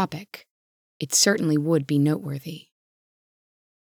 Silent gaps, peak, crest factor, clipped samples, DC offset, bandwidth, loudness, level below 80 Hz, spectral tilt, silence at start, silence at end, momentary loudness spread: 0.50-1.00 s; -6 dBFS; 20 dB; under 0.1%; under 0.1%; over 20 kHz; -22 LUFS; -76 dBFS; -4 dB/octave; 0 s; 1.3 s; 23 LU